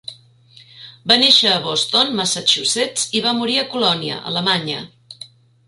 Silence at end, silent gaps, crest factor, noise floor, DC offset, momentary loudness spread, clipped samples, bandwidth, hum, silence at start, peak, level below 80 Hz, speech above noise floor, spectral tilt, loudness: 0.4 s; none; 20 dB; -48 dBFS; under 0.1%; 21 LU; under 0.1%; 11.5 kHz; none; 0.1 s; 0 dBFS; -62 dBFS; 30 dB; -2 dB/octave; -15 LUFS